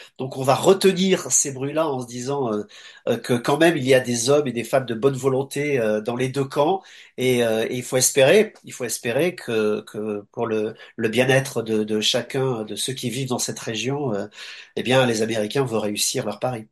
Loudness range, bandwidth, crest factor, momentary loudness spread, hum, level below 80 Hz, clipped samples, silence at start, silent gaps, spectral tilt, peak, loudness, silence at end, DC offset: 3 LU; 12.5 kHz; 18 dB; 10 LU; none; -64 dBFS; under 0.1%; 0 s; none; -4 dB/octave; -2 dBFS; -21 LUFS; 0.05 s; under 0.1%